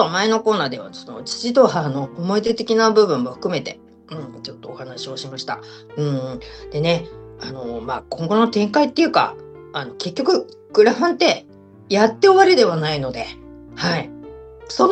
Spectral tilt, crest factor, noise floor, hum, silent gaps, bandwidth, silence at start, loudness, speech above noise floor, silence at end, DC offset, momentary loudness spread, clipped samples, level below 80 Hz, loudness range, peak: -5 dB/octave; 18 dB; -38 dBFS; none; none; 8.8 kHz; 0 s; -19 LUFS; 19 dB; 0 s; under 0.1%; 19 LU; under 0.1%; -52 dBFS; 10 LU; 0 dBFS